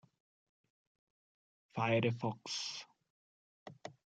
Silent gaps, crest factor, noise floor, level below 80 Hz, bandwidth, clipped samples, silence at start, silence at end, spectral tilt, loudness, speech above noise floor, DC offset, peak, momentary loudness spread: 3.10-3.66 s; 22 dB; under -90 dBFS; -84 dBFS; 9.2 kHz; under 0.1%; 1.75 s; 0.3 s; -5 dB/octave; -37 LUFS; over 54 dB; under 0.1%; -20 dBFS; 25 LU